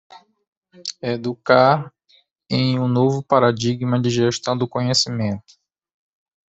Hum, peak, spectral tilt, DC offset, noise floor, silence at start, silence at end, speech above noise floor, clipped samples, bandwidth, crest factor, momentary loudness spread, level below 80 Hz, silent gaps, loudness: none; -2 dBFS; -5.5 dB/octave; under 0.1%; -59 dBFS; 0.1 s; 1.1 s; 40 dB; under 0.1%; 8.2 kHz; 18 dB; 12 LU; -58 dBFS; 0.48-0.62 s; -19 LUFS